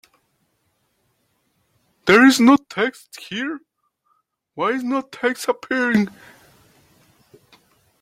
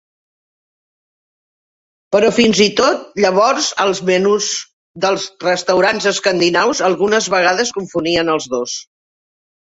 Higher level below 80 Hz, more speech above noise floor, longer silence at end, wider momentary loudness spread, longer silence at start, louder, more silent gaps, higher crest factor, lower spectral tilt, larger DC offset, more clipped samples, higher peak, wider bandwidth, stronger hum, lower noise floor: second, -62 dBFS vs -54 dBFS; second, 50 dB vs over 75 dB; first, 1.95 s vs 0.9 s; first, 17 LU vs 8 LU; about the same, 2.05 s vs 2.1 s; second, -18 LUFS vs -15 LUFS; second, none vs 4.73-4.94 s; about the same, 20 dB vs 16 dB; first, -4.5 dB/octave vs -3 dB/octave; neither; neither; about the same, 0 dBFS vs 0 dBFS; first, 16 kHz vs 8 kHz; neither; second, -68 dBFS vs under -90 dBFS